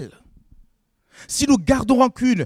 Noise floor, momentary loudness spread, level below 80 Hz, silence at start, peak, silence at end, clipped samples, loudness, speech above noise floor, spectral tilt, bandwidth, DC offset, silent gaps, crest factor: -62 dBFS; 10 LU; -42 dBFS; 0 s; -4 dBFS; 0 s; under 0.1%; -18 LUFS; 45 dB; -4.5 dB/octave; 15 kHz; under 0.1%; none; 18 dB